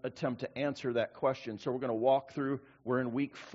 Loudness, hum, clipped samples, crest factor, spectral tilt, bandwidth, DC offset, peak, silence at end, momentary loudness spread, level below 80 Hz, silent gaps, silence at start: -34 LUFS; none; under 0.1%; 18 dB; -5.5 dB/octave; 7.6 kHz; under 0.1%; -16 dBFS; 0 s; 7 LU; -74 dBFS; none; 0.05 s